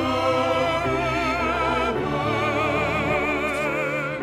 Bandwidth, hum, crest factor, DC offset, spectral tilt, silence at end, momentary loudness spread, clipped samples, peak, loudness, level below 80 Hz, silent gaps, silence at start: 16 kHz; none; 14 dB; under 0.1%; -5.5 dB/octave; 0 s; 2 LU; under 0.1%; -10 dBFS; -23 LUFS; -42 dBFS; none; 0 s